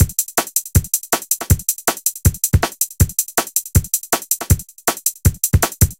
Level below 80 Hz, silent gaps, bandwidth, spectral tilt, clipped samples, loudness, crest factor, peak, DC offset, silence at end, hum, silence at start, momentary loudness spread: -26 dBFS; none; 17.5 kHz; -4 dB/octave; under 0.1%; -17 LUFS; 18 dB; 0 dBFS; under 0.1%; 0.05 s; none; 0 s; 3 LU